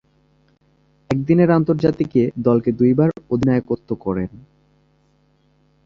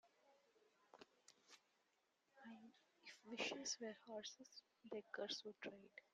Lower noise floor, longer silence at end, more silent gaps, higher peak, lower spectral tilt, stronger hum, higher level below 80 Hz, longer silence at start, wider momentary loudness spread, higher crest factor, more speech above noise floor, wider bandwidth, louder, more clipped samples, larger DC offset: second, -60 dBFS vs -85 dBFS; first, 1.5 s vs 0.1 s; neither; first, -2 dBFS vs -34 dBFS; first, -10 dB/octave vs -1.5 dB/octave; neither; first, -48 dBFS vs under -90 dBFS; first, 1.1 s vs 0.05 s; second, 9 LU vs 20 LU; about the same, 18 dB vs 22 dB; first, 42 dB vs 32 dB; second, 7.2 kHz vs 11.5 kHz; first, -18 LUFS vs -52 LUFS; neither; neither